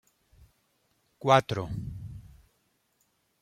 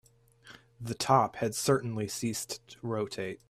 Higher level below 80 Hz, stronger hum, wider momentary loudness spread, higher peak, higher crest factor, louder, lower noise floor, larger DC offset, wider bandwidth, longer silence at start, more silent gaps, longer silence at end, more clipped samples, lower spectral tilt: first, -54 dBFS vs -66 dBFS; neither; first, 22 LU vs 13 LU; first, -6 dBFS vs -10 dBFS; about the same, 26 dB vs 22 dB; first, -27 LUFS vs -31 LUFS; first, -73 dBFS vs -57 dBFS; neither; about the same, 15.5 kHz vs 16 kHz; first, 1.2 s vs 0.45 s; neither; first, 1.2 s vs 0.15 s; neither; about the same, -5.5 dB/octave vs -4.5 dB/octave